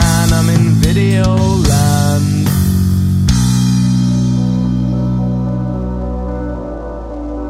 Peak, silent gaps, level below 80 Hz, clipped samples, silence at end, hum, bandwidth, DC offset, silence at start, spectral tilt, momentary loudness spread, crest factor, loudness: 0 dBFS; none; -24 dBFS; under 0.1%; 0 s; none; 16 kHz; under 0.1%; 0 s; -6 dB/octave; 11 LU; 12 dB; -13 LUFS